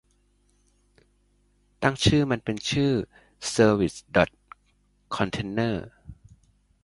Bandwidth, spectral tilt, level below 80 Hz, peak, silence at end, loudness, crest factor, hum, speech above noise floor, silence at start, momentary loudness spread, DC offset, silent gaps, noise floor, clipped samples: 11.5 kHz; -5 dB/octave; -48 dBFS; -4 dBFS; 0.7 s; -25 LUFS; 22 dB; 50 Hz at -50 dBFS; 42 dB; 1.8 s; 13 LU; under 0.1%; none; -66 dBFS; under 0.1%